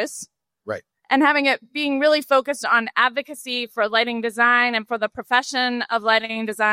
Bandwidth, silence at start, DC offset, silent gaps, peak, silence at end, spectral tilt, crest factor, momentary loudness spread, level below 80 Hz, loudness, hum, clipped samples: 16 kHz; 0 s; under 0.1%; none; -4 dBFS; 0 s; -2.5 dB/octave; 16 dB; 14 LU; -70 dBFS; -20 LUFS; none; under 0.1%